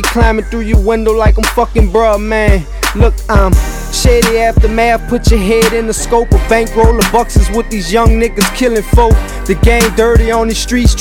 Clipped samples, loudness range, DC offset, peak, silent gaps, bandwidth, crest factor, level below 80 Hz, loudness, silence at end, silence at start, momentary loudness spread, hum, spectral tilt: 1%; 1 LU; under 0.1%; 0 dBFS; none; 17 kHz; 10 dB; -14 dBFS; -11 LUFS; 0 s; 0 s; 4 LU; none; -5 dB/octave